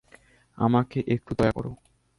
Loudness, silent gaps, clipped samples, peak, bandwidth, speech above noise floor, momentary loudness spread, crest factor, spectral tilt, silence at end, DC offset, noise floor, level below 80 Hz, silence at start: -26 LUFS; none; under 0.1%; -10 dBFS; 11.5 kHz; 32 dB; 9 LU; 18 dB; -8.5 dB/octave; 0.45 s; under 0.1%; -57 dBFS; -50 dBFS; 0.6 s